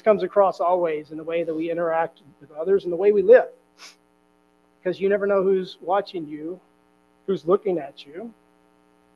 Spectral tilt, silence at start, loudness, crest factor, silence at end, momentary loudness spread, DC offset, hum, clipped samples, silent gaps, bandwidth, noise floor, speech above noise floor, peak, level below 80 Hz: -7.5 dB/octave; 0.05 s; -22 LUFS; 20 dB; 0.85 s; 20 LU; under 0.1%; none; under 0.1%; none; 7.2 kHz; -61 dBFS; 40 dB; -4 dBFS; -70 dBFS